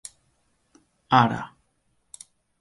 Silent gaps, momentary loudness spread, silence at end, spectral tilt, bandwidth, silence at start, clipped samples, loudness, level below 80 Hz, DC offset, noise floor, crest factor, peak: none; 25 LU; 1.15 s; -5.5 dB/octave; 11.5 kHz; 1.1 s; under 0.1%; -22 LUFS; -64 dBFS; under 0.1%; -70 dBFS; 26 dB; -2 dBFS